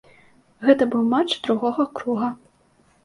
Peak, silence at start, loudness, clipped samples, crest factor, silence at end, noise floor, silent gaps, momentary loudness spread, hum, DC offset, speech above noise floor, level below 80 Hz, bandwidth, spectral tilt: -2 dBFS; 0.6 s; -21 LUFS; under 0.1%; 20 dB; 0.7 s; -59 dBFS; none; 7 LU; none; under 0.1%; 39 dB; -64 dBFS; 11 kHz; -5.5 dB/octave